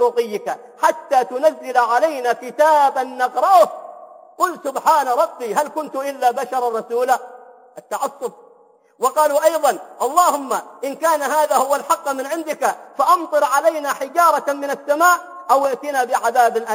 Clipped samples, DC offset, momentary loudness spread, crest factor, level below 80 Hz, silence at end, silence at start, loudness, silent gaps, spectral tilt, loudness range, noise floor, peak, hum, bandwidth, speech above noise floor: under 0.1%; under 0.1%; 9 LU; 16 dB; -74 dBFS; 0 s; 0 s; -18 LUFS; none; -2 dB/octave; 4 LU; -52 dBFS; -2 dBFS; none; 17 kHz; 34 dB